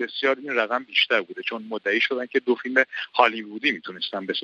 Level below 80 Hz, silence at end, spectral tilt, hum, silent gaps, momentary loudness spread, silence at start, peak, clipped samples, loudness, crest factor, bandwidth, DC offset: -78 dBFS; 0 s; -4 dB/octave; none; none; 9 LU; 0 s; -2 dBFS; under 0.1%; -23 LUFS; 22 dB; 7.4 kHz; under 0.1%